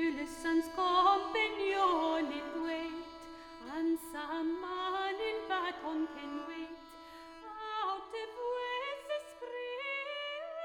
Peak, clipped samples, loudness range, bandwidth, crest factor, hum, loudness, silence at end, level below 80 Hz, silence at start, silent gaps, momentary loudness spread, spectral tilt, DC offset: -16 dBFS; under 0.1%; 8 LU; 19 kHz; 20 dB; none; -35 LUFS; 0 s; -66 dBFS; 0 s; none; 17 LU; -3 dB/octave; under 0.1%